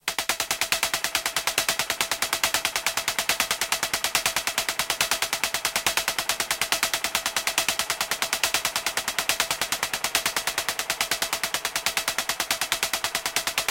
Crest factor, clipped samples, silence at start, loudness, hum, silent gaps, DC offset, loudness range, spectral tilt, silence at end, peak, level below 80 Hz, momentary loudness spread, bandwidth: 26 dB; under 0.1%; 0.05 s; -24 LUFS; none; none; under 0.1%; 1 LU; 0.5 dB/octave; 0 s; 0 dBFS; -54 dBFS; 3 LU; 17 kHz